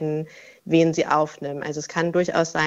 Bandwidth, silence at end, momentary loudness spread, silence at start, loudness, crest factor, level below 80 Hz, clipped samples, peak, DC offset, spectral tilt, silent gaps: 8 kHz; 0 s; 11 LU; 0 s; -23 LUFS; 18 dB; -62 dBFS; under 0.1%; -4 dBFS; under 0.1%; -5.5 dB/octave; none